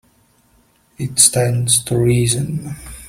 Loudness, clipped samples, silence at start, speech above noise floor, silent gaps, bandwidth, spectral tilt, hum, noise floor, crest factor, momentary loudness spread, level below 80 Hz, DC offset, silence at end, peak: -15 LUFS; under 0.1%; 1 s; 40 dB; none; 16.5 kHz; -4 dB/octave; none; -56 dBFS; 18 dB; 15 LU; -42 dBFS; under 0.1%; 0 s; 0 dBFS